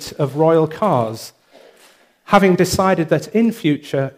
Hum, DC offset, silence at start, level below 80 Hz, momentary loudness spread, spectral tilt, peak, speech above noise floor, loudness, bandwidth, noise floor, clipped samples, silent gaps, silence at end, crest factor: none; under 0.1%; 0 s; -48 dBFS; 9 LU; -6 dB/octave; 0 dBFS; 35 dB; -16 LUFS; 15.5 kHz; -51 dBFS; under 0.1%; none; 0.1 s; 18 dB